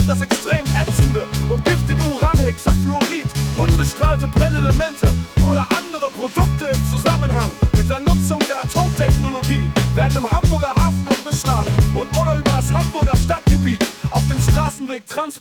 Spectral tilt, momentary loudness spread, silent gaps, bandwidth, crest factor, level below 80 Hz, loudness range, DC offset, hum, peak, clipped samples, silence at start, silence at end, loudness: -6 dB/octave; 4 LU; none; 19 kHz; 12 dB; -24 dBFS; 1 LU; under 0.1%; none; -4 dBFS; under 0.1%; 0 s; 0 s; -18 LUFS